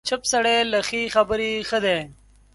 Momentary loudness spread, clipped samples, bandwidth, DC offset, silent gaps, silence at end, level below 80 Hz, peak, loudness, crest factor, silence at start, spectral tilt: 5 LU; under 0.1%; 11.5 kHz; under 0.1%; none; 0.4 s; -52 dBFS; -4 dBFS; -21 LUFS; 18 dB; 0.05 s; -2 dB/octave